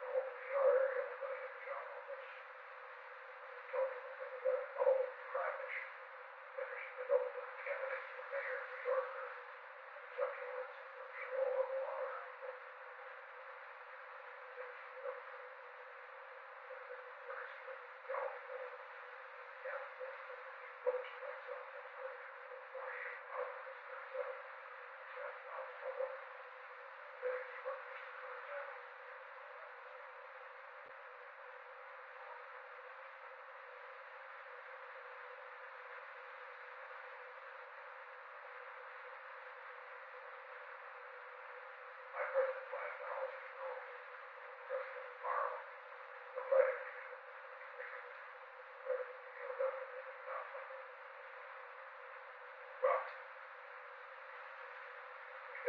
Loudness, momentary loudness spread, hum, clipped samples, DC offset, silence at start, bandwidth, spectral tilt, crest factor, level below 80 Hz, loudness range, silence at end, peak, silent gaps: -45 LUFS; 13 LU; none; under 0.1%; under 0.1%; 0 s; 5.2 kHz; 4 dB/octave; 26 dB; under -90 dBFS; 10 LU; 0 s; -20 dBFS; none